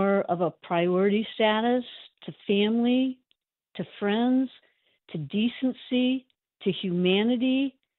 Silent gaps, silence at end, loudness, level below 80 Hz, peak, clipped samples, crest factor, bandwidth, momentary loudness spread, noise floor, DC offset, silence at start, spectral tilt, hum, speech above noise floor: none; 0.3 s; -26 LUFS; -72 dBFS; -10 dBFS; under 0.1%; 16 dB; 4.2 kHz; 15 LU; -75 dBFS; under 0.1%; 0 s; -4.5 dB/octave; none; 49 dB